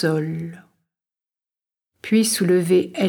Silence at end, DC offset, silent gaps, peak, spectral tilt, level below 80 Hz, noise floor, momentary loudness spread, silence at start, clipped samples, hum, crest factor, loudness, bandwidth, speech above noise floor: 0 s; under 0.1%; none; -6 dBFS; -5 dB/octave; -70 dBFS; under -90 dBFS; 16 LU; 0 s; under 0.1%; none; 14 dB; -19 LUFS; 18.5 kHz; over 71 dB